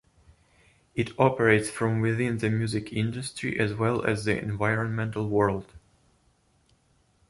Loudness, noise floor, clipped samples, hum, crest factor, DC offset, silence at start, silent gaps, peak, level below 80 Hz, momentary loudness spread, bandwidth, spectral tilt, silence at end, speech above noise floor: -27 LUFS; -66 dBFS; under 0.1%; none; 22 dB; under 0.1%; 0.95 s; none; -6 dBFS; -54 dBFS; 8 LU; 11.5 kHz; -6.5 dB/octave; 1.5 s; 40 dB